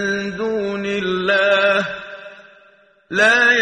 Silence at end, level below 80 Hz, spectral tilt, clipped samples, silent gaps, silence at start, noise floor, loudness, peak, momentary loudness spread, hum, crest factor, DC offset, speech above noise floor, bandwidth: 0 s; -56 dBFS; -3.5 dB/octave; under 0.1%; none; 0 s; -52 dBFS; -17 LUFS; -2 dBFS; 16 LU; none; 16 dB; under 0.1%; 34 dB; 9.8 kHz